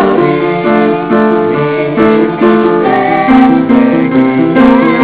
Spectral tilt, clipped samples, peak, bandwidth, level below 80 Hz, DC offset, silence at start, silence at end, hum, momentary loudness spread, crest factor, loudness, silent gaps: -11 dB/octave; 1%; 0 dBFS; 4 kHz; -40 dBFS; 0.4%; 0 s; 0 s; none; 4 LU; 8 dB; -8 LUFS; none